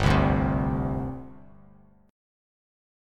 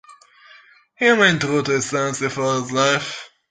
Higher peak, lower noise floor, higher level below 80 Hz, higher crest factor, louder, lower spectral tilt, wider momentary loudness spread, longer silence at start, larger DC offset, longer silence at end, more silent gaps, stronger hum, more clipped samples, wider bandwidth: second, -8 dBFS vs 0 dBFS; first, -55 dBFS vs -50 dBFS; first, -36 dBFS vs -60 dBFS; about the same, 20 dB vs 20 dB; second, -26 LUFS vs -18 LUFS; first, -7.5 dB/octave vs -3.5 dB/octave; first, 18 LU vs 8 LU; about the same, 0 s vs 0.1 s; neither; first, 1 s vs 0.25 s; neither; first, 50 Hz at -55 dBFS vs none; neither; about the same, 10.5 kHz vs 9.6 kHz